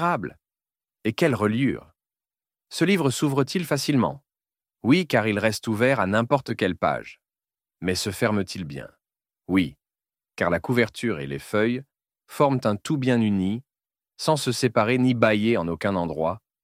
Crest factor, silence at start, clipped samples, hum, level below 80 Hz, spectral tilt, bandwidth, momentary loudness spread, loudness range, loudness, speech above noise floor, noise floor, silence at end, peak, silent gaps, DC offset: 22 dB; 0 s; under 0.1%; none; -58 dBFS; -5.5 dB/octave; 16 kHz; 11 LU; 4 LU; -24 LUFS; over 67 dB; under -90 dBFS; 0.25 s; -2 dBFS; none; under 0.1%